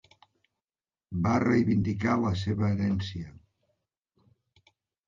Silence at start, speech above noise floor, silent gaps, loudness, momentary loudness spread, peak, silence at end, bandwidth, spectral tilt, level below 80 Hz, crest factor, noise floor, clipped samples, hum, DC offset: 1.1 s; over 63 dB; none; -28 LUFS; 14 LU; -12 dBFS; 1.75 s; 7.4 kHz; -7.5 dB/octave; -48 dBFS; 18 dB; under -90 dBFS; under 0.1%; none; under 0.1%